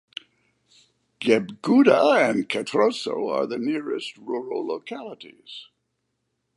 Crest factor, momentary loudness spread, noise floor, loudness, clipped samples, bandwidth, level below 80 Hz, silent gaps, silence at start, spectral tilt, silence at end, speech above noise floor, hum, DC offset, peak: 20 dB; 22 LU; -76 dBFS; -22 LUFS; under 0.1%; 11.5 kHz; -76 dBFS; none; 1.2 s; -5 dB/octave; 0.95 s; 54 dB; none; under 0.1%; -4 dBFS